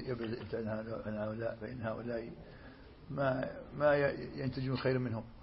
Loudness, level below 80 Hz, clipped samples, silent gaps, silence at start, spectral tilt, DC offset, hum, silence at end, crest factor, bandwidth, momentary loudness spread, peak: -37 LUFS; -58 dBFS; under 0.1%; none; 0 s; -6 dB/octave; under 0.1%; none; 0 s; 18 dB; 5.6 kHz; 17 LU; -18 dBFS